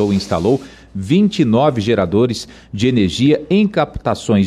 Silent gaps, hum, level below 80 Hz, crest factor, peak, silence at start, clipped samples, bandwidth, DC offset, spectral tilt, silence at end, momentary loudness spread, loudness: none; none; -42 dBFS; 12 dB; -4 dBFS; 0 s; under 0.1%; 11.5 kHz; under 0.1%; -6.5 dB/octave; 0 s; 7 LU; -16 LUFS